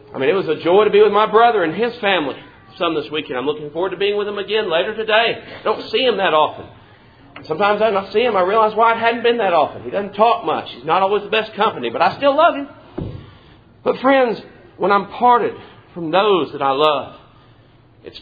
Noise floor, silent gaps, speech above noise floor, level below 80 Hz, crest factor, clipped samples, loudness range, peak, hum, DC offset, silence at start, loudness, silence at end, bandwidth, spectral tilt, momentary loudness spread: -49 dBFS; none; 32 dB; -54 dBFS; 18 dB; under 0.1%; 3 LU; 0 dBFS; none; under 0.1%; 0.15 s; -17 LUFS; 0 s; 5 kHz; -7 dB/octave; 12 LU